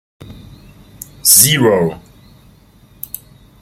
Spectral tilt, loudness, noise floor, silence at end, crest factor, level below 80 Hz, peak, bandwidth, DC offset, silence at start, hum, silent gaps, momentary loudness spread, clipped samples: -2.5 dB/octave; -10 LUFS; -46 dBFS; 1.65 s; 18 dB; -46 dBFS; 0 dBFS; over 20 kHz; under 0.1%; 0.3 s; 50 Hz at -45 dBFS; none; 26 LU; 0.2%